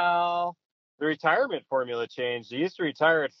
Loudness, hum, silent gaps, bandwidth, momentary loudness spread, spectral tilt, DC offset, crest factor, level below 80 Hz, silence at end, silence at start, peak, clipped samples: -27 LUFS; none; 0.65-0.98 s; 6.6 kHz; 8 LU; -2 dB/octave; under 0.1%; 18 dB; -84 dBFS; 0.1 s; 0 s; -8 dBFS; under 0.1%